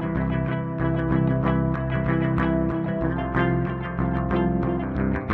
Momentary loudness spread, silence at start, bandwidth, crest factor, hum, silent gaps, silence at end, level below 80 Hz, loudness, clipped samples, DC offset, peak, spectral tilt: 3 LU; 0 s; 4.3 kHz; 14 dB; none; none; 0 s; -34 dBFS; -24 LUFS; under 0.1%; under 0.1%; -10 dBFS; -10.5 dB/octave